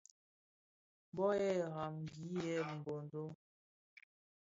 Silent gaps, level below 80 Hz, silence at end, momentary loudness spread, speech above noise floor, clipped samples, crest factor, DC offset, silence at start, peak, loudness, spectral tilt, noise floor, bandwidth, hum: 3.35-3.97 s; -78 dBFS; 0.4 s; 13 LU; over 50 dB; under 0.1%; 18 dB; under 0.1%; 1.15 s; -24 dBFS; -41 LUFS; -6 dB/octave; under -90 dBFS; 7.6 kHz; none